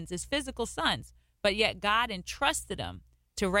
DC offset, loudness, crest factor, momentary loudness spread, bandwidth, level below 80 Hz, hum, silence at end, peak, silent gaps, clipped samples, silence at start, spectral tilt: under 0.1%; -30 LUFS; 20 dB; 11 LU; 16.5 kHz; -50 dBFS; none; 0 s; -10 dBFS; none; under 0.1%; 0 s; -3 dB/octave